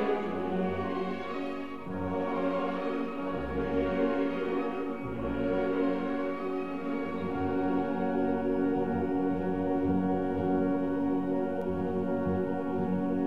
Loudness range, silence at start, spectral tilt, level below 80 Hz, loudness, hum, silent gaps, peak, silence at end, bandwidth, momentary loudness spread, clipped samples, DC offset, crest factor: 3 LU; 0 s; -9 dB/octave; -54 dBFS; -31 LUFS; none; none; -16 dBFS; 0 s; 6 kHz; 5 LU; under 0.1%; 0.6%; 14 dB